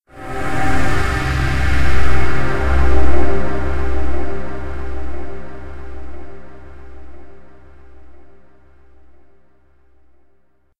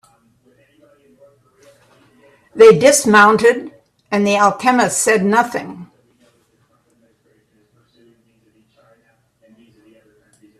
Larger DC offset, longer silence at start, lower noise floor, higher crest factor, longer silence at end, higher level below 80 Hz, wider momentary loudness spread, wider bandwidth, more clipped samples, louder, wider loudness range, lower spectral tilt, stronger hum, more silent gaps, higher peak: neither; second, 0 s vs 2.55 s; about the same, -58 dBFS vs -59 dBFS; about the same, 14 dB vs 18 dB; second, 0 s vs 4.75 s; first, -24 dBFS vs -60 dBFS; about the same, 22 LU vs 22 LU; second, 12 kHz vs 14 kHz; neither; second, -21 LUFS vs -12 LUFS; first, 21 LU vs 9 LU; first, -6.5 dB/octave vs -3.5 dB/octave; neither; neither; about the same, 0 dBFS vs 0 dBFS